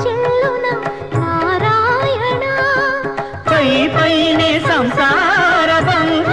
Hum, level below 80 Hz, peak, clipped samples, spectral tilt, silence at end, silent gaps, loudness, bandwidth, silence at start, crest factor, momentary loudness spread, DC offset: none; -44 dBFS; -2 dBFS; under 0.1%; -5.5 dB/octave; 0 s; none; -14 LUFS; 11.5 kHz; 0 s; 12 dB; 8 LU; 0.6%